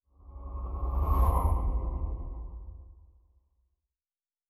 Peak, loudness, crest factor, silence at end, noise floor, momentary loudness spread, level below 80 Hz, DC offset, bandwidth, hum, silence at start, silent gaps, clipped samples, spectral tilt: -14 dBFS; -32 LUFS; 18 dB; 1.55 s; under -90 dBFS; 21 LU; -32 dBFS; under 0.1%; 14 kHz; none; 0.25 s; none; under 0.1%; -9 dB/octave